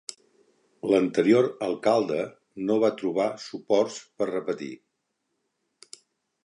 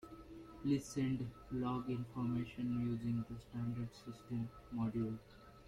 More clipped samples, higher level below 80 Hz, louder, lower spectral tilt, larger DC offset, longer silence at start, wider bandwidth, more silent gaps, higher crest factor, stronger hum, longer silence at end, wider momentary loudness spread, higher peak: neither; second, -74 dBFS vs -62 dBFS; first, -26 LUFS vs -42 LUFS; second, -5.5 dB/octave vs -7.5 dB/octave; neither; first, 0.85 s vs 0 s; second, 11 kHz vs 14 kHz; neither; about the same, 20 dB vs 16 dB; neither; first, 1.7 s vs 0 s; about the same, 14 LU vs 12 LU; first, -8 dBFS vs -24 dBFS